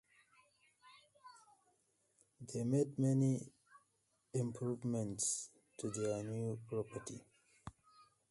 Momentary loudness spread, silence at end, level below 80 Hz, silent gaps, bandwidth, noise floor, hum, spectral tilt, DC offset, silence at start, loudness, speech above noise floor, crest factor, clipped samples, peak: 22 LU; 0.3 s; -74 dBFS; none; 11.5 kHz; -81 dBFS; none; -6 dB/octave; under 0.1%; 0.85 s; -40 LUFS; 42 dB; 18 dB; under 0.1%; -24 dBFS